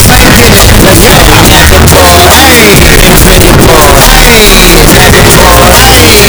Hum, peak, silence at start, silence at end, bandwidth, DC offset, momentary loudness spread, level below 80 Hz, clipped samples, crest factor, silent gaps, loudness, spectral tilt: none; 0 dBFS; 0 s; 0 s; over 20 kHz; under 0.1%; 1 LU; -8 dBFS; 100%; 0 dB; none; 0 LUFS; -3.5 dB/octave